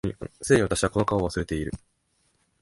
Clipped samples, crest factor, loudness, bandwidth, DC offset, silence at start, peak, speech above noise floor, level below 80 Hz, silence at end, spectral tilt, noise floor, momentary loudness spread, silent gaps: under 0.1%; 20 dB; -25 LUFS; 11.5 kHz; under 0.1%; 0.05 s; -6 dBFS; 45 dB; -44 dBFS; 0.85 s; -5.5 dB/octave; -70 dBFS; 14 LU; none